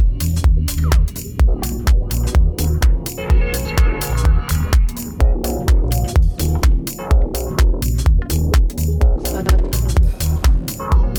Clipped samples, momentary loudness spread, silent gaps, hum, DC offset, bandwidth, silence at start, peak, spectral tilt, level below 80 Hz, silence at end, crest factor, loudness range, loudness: under 0.1%; 2 LU; none; none; under 0.1%; over 20 kHz; 0 s; -2 dBFS; -5.5 dB/octave; -16 dBFS; 0 s; 12 dB; 1 LU; -18 LUFS